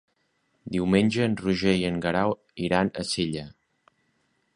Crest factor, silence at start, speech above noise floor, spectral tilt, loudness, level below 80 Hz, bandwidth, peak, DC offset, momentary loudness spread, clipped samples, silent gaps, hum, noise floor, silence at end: 22 dB; 0.65 s; 47 dB; -5.5 dB/octave; -25 LUFS; -52 dBFS; 11 kHz; -6 dBFS; under 0.1%; 10 LU; under 0.1%; none; none; -71 dBFS; 1.05 s